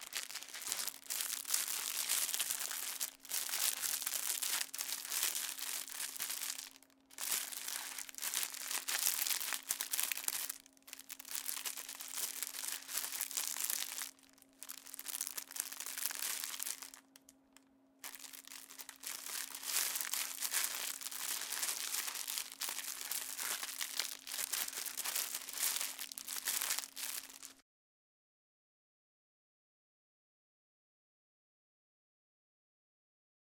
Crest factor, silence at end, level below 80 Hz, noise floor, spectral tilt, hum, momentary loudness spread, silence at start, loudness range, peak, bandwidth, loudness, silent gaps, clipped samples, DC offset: 32 dB; 6.05 s; -88 dBFS; -67 dBFS; 3 dB/octave; none; 12 LU; 0 s; 6 LU; -10 dBFS; 19 kHz; -38 LUFS; none; under 0.1%; under 0.1%